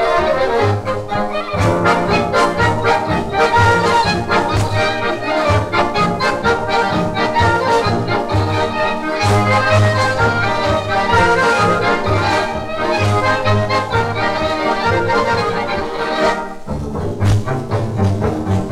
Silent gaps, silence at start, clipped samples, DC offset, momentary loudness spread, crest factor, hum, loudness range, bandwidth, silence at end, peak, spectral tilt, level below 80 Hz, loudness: none; 0 s; under 0.1%; under 0.1%; 7 LU; 12 dB; none; 3 LU; 13 kHz; 0 s; -2 dBFS; -5.5 dB/octave; -34 dBFS; -15 LUFS